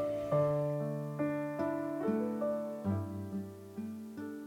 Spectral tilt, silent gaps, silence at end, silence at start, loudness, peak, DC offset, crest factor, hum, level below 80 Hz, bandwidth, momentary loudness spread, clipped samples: -9 dB/octave; none; 0 s; 0 s; -36 LUFS; -20 dBFS; under 0.1%; 14 dB; none; -70 dBFS; 17.5 kHz; 12 LU; under 0.1%